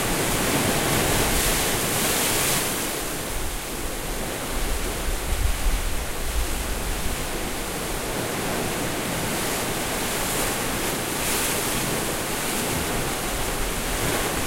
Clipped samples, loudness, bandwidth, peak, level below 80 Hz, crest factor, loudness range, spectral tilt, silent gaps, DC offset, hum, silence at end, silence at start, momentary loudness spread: under 0.1%; -24 LUFS; 16 kHz; -8 dBFS; -32 dBFS; 16 dB; 6 LU; -3 dB/octave; none; under 0.1%; none; 0 s; 0 s; 8 LU